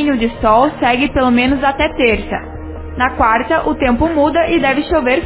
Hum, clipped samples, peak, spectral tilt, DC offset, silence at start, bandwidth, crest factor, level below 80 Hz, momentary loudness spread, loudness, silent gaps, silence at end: none; under 0.1%; 0 dBFS; -9.5 dB/octave; under 0.1%; 0 s; 4 kHz; 14 dB; -30 dBFS; 7 LU; -14 LUFS; none; 0 s